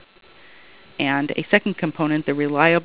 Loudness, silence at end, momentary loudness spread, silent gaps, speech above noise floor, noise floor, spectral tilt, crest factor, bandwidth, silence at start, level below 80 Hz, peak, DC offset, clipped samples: -21 LUFS; 0 s; 7 LU; none; 28 dB; -48 dBFS; -9.5 dB/octave; 22 dB; 4 kHz; 1 s; -64 dBFS; 0 dBFS; 0.4%; under 0.1%